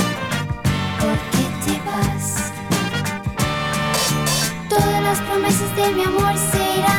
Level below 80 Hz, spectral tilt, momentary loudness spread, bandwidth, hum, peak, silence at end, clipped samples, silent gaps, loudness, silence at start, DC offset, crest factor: -38 dBFS; -4 dB/octave; 5 LU; over 20 kHz; none; -2 dBFS; 0 s; under 0.1%; none; -19 LUFS; 0 s; under 0.1%; 16 dB